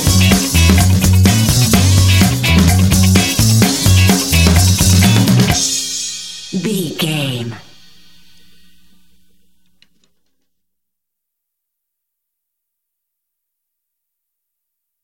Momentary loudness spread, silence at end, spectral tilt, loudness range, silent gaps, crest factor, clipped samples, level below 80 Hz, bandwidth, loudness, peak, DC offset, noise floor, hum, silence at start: 10 LU; 7.45 s; -4 dB/octave; 13 LU; none; 14 dB; under 0.1%; -26 dBFS; 17 kHz; -11 LUFS; 0 dBFS; under 0.1%; -78 dBFS; none; 0 s